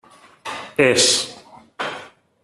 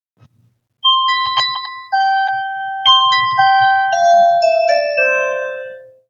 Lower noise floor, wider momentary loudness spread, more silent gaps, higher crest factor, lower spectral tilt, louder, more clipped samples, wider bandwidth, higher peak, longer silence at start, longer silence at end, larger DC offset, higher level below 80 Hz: second, -43 dBFS vs -58 dBFS; first, 20 LU vs 12 LU; neither; first, 22 dB vs 14 dB; about the same, -1.5 dB/octave vs -0.5 dB/octave; second, -18 LUFS vs -13 LUFS; neither; first, 13.5 kHz vs 7.4 kHz; about the same, 0 dBFS vs 0 dBFS; second, 0.45 s vs 0.85 s; about the same, 0.35 s vs 0.25 s; neither; first, -60 dBFS vs -70 dBFS